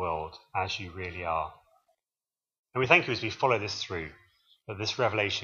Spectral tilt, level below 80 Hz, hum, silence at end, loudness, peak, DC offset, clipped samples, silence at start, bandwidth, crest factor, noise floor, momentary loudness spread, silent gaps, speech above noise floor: -4.5 dB/octave; -58 dBFS; none; 0 s; -29 LUFS; -6 dBFS; under 0.1%; under 0.1%; 0 s; 7.4 kHz; 26 dB; under -90 dBFS; 15 LU; 2.59-2.64 s; over 60 dB